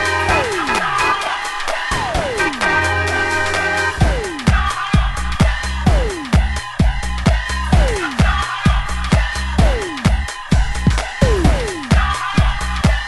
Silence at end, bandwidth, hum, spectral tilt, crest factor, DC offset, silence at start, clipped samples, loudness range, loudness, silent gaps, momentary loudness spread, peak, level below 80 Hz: 0 s; 12 kHz; none; -5 dB/octave; 16 dB; under 0.1%; 0 s; under 0.1%; 1 LU; -17 LUFS; none; 4 LU; 0 dBFS; -20 dBFS